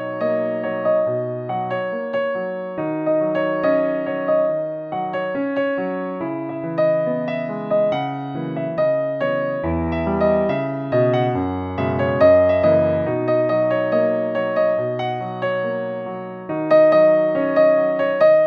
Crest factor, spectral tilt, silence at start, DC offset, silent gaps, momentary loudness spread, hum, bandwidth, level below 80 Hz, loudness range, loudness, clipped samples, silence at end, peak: 16 dB; -9.5 dB/octave; 0 s; under 0.1%; none; 11 LU; none; 5.4 kHz; -48 dBFS; 5 LU; -20 LUFS; under 0.1%; 0 s; -4 dBFS